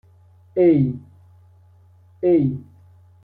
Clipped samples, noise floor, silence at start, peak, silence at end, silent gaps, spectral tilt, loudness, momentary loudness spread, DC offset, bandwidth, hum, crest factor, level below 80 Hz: under 0.1%; -51 dBFS; 0.55 s; -6 dBFS; 0.6 s; none; -12.5 dB/octave; -19 LUFS; 16 LU; under 0.1%; 4.1 kHz; none; 16 dB; -56 dBFS